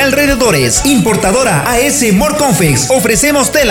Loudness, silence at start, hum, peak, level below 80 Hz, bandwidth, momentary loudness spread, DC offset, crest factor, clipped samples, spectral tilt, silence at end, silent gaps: -9 LUFS; 0 s; none; 0 dBFS; -28 dBFS; over 20 kHz; 1 LU; under 0.1%; 10 dB; under 0.1%; -3.5 dB/octave; 0 s; none